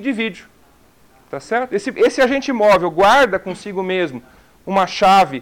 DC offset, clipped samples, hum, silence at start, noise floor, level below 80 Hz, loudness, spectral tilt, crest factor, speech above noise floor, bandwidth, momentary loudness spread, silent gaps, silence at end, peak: under 0.1%; under 0.1%; none; 0 s; -52 dBFS; -50 dBFS; -16 LUFS; -4.5 dB/octave; 12 dB; 36 dB; 18 kHz; 14 LU; none; 0 s; -6 dBFS